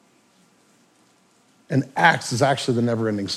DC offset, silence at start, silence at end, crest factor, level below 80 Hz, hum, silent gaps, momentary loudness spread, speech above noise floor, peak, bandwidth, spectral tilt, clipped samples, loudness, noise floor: under 0.1%; 1.7 s; 0 s; 22 dB; -68 dBFS; none; none; 7 LU; 39 dB; -2 dBFS; 13.5 kHz; -5 dB/octave; under 0.1%; -21 LUFS; -59 dBFS